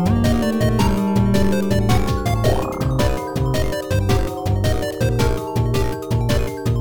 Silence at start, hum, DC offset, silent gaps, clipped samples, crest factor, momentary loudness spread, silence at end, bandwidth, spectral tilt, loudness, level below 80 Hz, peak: 0 s; none; 2%; none; under 0.1%; 14 dB; 4 LU; 0 s; 18 kHz; -6.5 dB/octave; -20 LUFS; -28 dBFS; -4 dBFS